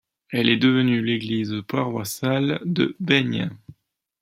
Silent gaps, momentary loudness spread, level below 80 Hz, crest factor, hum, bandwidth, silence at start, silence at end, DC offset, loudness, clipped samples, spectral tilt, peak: none; 8 LU; -64 dBFS; 20 dB; none; 16.5 kHz; 0.3 s; 0.5 s; under 0.1%; -22 LUFS; under 0.1%; -5.5 dB/octave; -2 dBFS